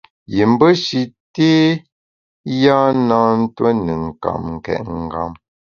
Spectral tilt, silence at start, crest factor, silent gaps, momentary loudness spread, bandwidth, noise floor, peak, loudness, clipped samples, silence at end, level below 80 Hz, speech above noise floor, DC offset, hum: -6.5 dB/octave; 0.3 s; 16 dB; 1.20-1.34 s, 1.92-2.44 s; 12 LU; 7.2 kHz; under -90 dBFS; 0 dBFS; -16 LUFS; under 0.1%; 0.45 s; -44 dBFS; over 75 dB; under 0.1%; none